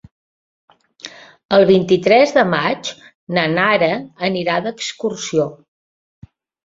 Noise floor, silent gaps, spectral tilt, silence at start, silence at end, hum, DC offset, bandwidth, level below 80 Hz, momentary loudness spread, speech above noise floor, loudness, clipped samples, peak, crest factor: -39 dBFS; 1.45-1.49 s, 3.15-3.27 s; -5 dB/octave; 1.05 s; 1.1 s; none; under 0.1%; 7.8 kHz; -58 dBFS; 15 LU; 23 dB; -16 LUFS; under 0.1%; -2 dBFS; 16 dB